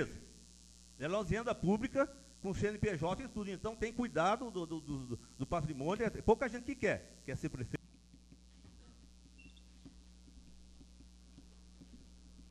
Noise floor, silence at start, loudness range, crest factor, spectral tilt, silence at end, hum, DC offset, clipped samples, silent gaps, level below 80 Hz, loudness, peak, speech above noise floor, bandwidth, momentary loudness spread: -61 dBFS; 0 s; 12 LU; 22 dB; -6 dB/octave; 0 s; none; under 0.1%; under 0.1%; none; -56 dBFS; -38 LUFS; -18 dBFS; 24 dB; 12.5 kHz; 25 LU